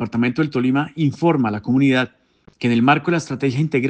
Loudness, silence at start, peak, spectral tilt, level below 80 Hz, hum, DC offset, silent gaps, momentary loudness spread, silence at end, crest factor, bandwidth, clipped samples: -19 LUFS; 0 s; -2 dBFS; -7 dB/octave; -60 dBFS; none; under 0.1%; none; 6 LU; 0 s; 16 dB; 8.8 kHz; under 0.1%